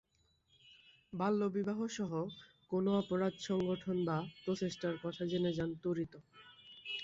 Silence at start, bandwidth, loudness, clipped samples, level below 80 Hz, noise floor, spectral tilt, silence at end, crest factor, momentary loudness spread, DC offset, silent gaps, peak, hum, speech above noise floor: 0.65 s; 7.8 kHz; -38 LUFS; under 0.1%; -70 dBFS; -75 dBFS; -6 dB/octave; 0 s; 16 dB; 13 LU; under 0.1%; none; -22 dBFS; none; 38 dB